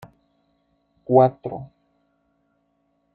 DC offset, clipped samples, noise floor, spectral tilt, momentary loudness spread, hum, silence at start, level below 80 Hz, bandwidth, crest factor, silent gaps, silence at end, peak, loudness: under 0.1%; under 0.1%; -69 dBFS; -11 dB/octave; 26 LU; none; 1.1 s; -64 dBFS; 4.5 kHz; 22 dB; none; 1.5 s; -2 dBFS; -20 LUFS